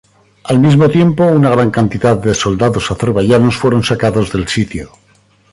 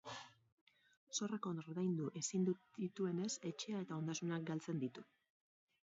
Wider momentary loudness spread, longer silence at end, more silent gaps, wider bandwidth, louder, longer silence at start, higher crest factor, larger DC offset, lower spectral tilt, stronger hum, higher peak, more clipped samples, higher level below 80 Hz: about the same, 7 LU vs 7 LU; second, 0.65 s vs 0.9 s; second, none vs 0.52-0.67 s, 0.97-1.07 s; first, 11.5 kHz vs 7.6 kHz; first, -12 LUFS vs -43 LUFS; first, 0.45 s vs 0.05 s; second, 12 dB vs 18 dB; neither; about the same, -6.5 dB/octave vs -6 dB/octave; neither; first, 0 dBFS vs -28 dBFS; neither; first, -36 dBFS vs -88 dBFS